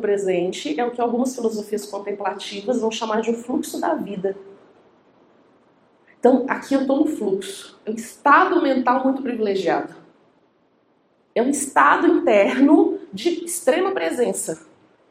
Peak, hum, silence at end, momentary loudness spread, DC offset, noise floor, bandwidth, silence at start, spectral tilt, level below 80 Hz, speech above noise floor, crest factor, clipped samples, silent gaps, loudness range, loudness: -2 dBFS; none; 0.5 s; 13 LU; under 0.1%; -62 dBFS; 16 kHz; 0 s; -4 dB/octave; -70 dBFS; 42 dB; 20 dB; under 0.1%; none; 7 LU; -20 LUFS